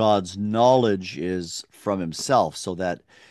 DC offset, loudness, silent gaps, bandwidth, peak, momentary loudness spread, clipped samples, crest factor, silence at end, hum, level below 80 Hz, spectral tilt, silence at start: under 0.1%; -23 LUFS; none; 12.5 kHz; -4 dBFS; 12 LU; under 0.1%; 18 dB; 0.35 s; none; -54 dBFS; -5 dB/octave; 0 s